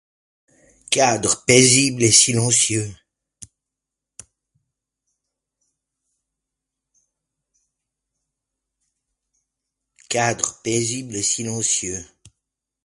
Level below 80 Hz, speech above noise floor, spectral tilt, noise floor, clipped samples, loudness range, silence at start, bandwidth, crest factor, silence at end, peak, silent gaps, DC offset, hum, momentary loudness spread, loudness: -56 dBFS; 66 dB; -2.5 dB/octave; -85 dBFS; under 0.1%; 12 LU; 0.9 s; 11.5 kHz; 24 dB; 0.8 s; 0 dBFS; none; under 0.1%; none; 12 LU; -17 LUFS